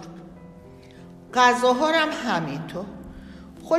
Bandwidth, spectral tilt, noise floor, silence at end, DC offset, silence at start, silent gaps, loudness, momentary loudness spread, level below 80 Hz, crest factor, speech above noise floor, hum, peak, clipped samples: 14.5 kHz; -4 dB/octave; -45 dBFS; 0 s; under 0.1%; 0 s; none; -22 LUFS; 25 LU; -54 dBFS; 20 dB; 24 dB; none; -4 dBFS; under 0.1%